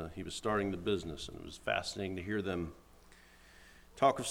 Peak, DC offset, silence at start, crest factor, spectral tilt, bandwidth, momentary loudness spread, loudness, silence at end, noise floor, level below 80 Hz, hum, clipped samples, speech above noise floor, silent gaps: -16 dBFS; under 0.1%; 0 s; 22 dB; -4.5 dB/octave; 17 kHz; 13 LU; -36 LUFS; 0 s; -60 dBFS; -58 dBFS; none; under 0.1%; 24 dB; none